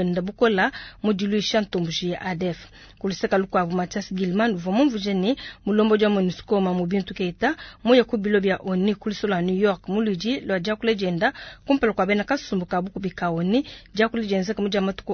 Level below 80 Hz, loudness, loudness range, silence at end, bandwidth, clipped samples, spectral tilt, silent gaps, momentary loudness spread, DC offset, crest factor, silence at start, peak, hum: -52 dBFS; -23 LUFS; 3 LU; 0 s; 6.6 kHz; under 0.1%; -6 dB/octave; none; 7 LU; under 0.1%; 18 dB; 0 s; -4 dBFS; none